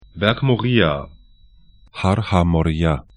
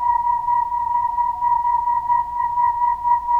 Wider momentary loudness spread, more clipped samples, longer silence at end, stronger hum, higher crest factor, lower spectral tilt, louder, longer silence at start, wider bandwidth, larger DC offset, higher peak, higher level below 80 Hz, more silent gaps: first, 10 LU vs 2 LU; neither; first, 0.15 s vs 0 s; neither; first, 20 dB vs 10 dB; first, -7.5 dB/octave vs -5 dB/octave; about the same, -19 LUFS vs -19 LUFS; first, 0.15 s vs 0 s; first, 10.5 kHz vs 3.1 kHz; neither; first, 0 dBFS vs -8 dBFS; first, -34 dBFS vs -46 dBFS; neither